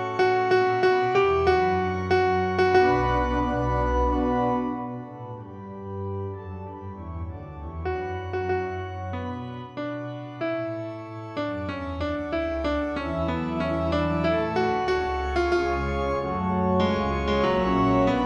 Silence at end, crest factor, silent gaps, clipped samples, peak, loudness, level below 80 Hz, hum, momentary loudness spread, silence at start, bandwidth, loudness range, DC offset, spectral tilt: 0 s; 16 dB; none; under 0.1%; -8 dBFS; -25 LUFS; -38 dBFS; none; 15 LU; 0 s; 7.8 kHz; 10 LU; under 0.1%; -7.5 dB/octave